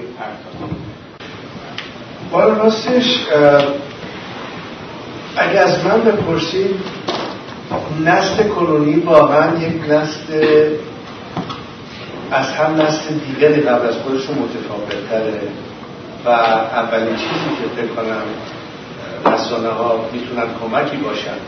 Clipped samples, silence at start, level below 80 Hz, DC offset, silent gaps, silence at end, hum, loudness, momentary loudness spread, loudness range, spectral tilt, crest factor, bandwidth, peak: under 0.1%; 0 s; -50 dBFS; under 0.1%; none; 0 s; none; -16 LUFS; 18 LU; 5 LU; -5.5 dB/octave; 16 dB; 6.6 kHz; 0 dBFS